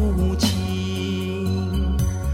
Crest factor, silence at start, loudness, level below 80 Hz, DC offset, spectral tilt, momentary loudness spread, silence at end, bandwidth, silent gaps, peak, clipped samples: 14 dB; 0 s; -23 LUFS; -26 dBFS; under 0.1%; -6 dB/octave; 4 LU; 0 s; 16.5 kHz; none; -6 dBFS; under 0.1%